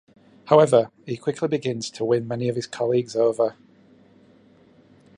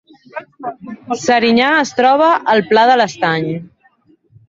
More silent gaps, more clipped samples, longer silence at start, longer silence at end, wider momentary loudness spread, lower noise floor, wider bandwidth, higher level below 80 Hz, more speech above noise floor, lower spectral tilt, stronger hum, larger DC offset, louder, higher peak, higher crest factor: neither; neither; about the same, 0.45 s vs 0.35 s; first, 1.65 s vs 0.85 s; second, 11 LU vs 19 LU; about the same, -54 dBFS vs -53 dBFS; first, 11 kHz vs 7.8 kHz; second, -68 dBFS vs -58 dBFS; second, 33 dB vs 40 dB; first, -6 dB/octave vs -4.5 dB/octave; neither; neither; second, -22 LUFS vs -13 LUFS; second, -4 dBFS vs 0 dBFS; first, 20 dB vs 14 dB